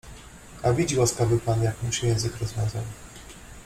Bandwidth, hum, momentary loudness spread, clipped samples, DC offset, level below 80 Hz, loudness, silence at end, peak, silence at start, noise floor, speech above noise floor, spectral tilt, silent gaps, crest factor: 15.5 kHz; none; 21 LU; under 0.1%; under 0.1%; -44 dBFS; -25 LUFS; 0 s; -8 dBFS; 0.05 s; -44 dBFS; 20 dB; -5 dB/octave; none; 18 dB